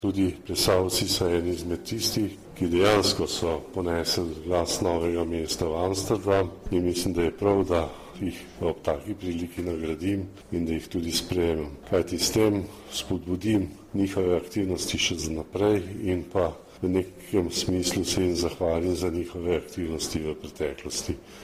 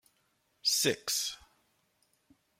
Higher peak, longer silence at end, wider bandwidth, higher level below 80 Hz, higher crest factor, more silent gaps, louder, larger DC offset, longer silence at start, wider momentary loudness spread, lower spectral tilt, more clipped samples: first, -6 dBFS vs -16 dBFS; second, 0 s vs 1.25 s; about the same, 15.5 kHz vs 16.5 kHz; first, -46 dBFS vs -74 dBFS; about the same, 20 dB vs 22 dB; neither; first, -27 LUFS vs -30 LUFS; neither; second, 0 s vs 0.65 s; about the same, 9 LU vs 10 LU; first, -4.5 dB/octave vs -1 dB/octave; neither